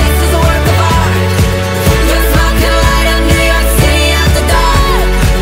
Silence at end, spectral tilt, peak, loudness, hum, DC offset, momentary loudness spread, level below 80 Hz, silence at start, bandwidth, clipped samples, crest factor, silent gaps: 0 s; -4.5 dB/octave; 0 dBFS; -10 LUFS; none; under 0.1%; 2 LU; -12 dBFS; 0 s; 16.5 kHz; 0.1%; 8 dB; none